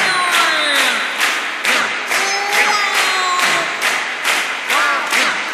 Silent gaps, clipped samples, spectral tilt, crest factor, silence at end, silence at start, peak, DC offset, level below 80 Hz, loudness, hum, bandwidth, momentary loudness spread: none; under 0.1%; 0.5 dB/octave; 16 dB; 0 s; 0 s; -2 dBFS; under 0.1%; -70 dBFS; -14 LUFS; none; 16 kHz; 4 LU